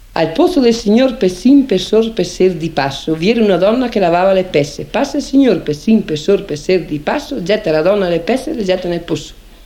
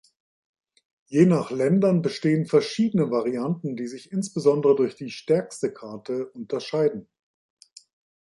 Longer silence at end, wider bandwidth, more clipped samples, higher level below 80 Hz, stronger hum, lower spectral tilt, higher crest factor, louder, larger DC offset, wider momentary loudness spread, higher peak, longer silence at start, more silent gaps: second, 0.05 s vs 1.25 s; first, 15.5 kHz vs 11.5 kHz; neither; first, -38 dBFS vs -70 dBFS; neither; about the same, -6 dB/octave vs -7 dB/octave; second, 12 dB vs 20 dB; first, -14 LUFS vs -24 LUFS; neither; second, 7 LU vs 11 LU; first, 0 dBFS vs -6 dBFS; second, 0.1 s vs 1.1 s; neither